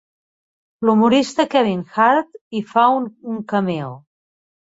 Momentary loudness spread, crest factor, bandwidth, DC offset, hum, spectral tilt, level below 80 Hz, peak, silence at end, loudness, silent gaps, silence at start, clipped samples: 13 LU; 16 dB; 8 kHz; under 0.1%; none; -6 dB/octave; -62 dBFS; -2 dBFS; 0.7 s; -18 LUFS; 2.41-2.51 s; 0.8 s; under 0.1%